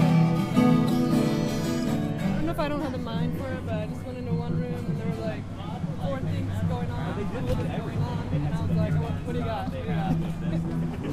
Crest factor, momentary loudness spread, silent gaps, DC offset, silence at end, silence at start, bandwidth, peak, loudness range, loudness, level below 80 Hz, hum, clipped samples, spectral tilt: 18 dB; 9 LU; none; under 0.1%; 0 s; 0 s; 15 kHz; -8 dBFS; 5 LU; -28 LUFS; -42 dBFS; none; under 0.1%; -7.5 dB/octave